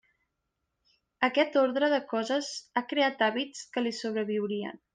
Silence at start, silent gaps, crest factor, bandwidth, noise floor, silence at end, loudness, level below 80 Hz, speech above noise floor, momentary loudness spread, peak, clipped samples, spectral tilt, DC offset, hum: 1.2 s; none; 18 dB; 9.8 kHz; -82 dBFS; 0.2 s; -29 LUFS; -78 dBFS; 53 dB; 8 LU; -12 dBFS; under 0.1%; -3.5 dB/octave; under 0.1%; none